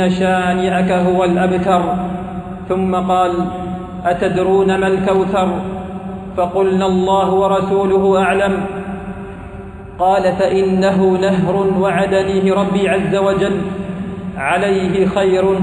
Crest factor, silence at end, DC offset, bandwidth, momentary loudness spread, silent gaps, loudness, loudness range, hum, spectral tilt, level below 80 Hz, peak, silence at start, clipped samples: 12 dB; 0 s; under 0.1%; 11 kHz; 12 LU; none; -15 LUFS; 2 LU; none; -7 dB/octave; -40 dBFS; -2 dBFS; 0 s; under 0.1%